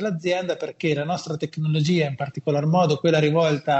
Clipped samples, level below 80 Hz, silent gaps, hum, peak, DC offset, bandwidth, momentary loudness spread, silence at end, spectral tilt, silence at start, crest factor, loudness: under 0.1%; -64 dBFS; none; none; -6 dBFS; under 0.1%; 8.2 kHz; 8 LU; 0 s; -6.5 dB/octave; 0 s; 16 dB; -22 LUFS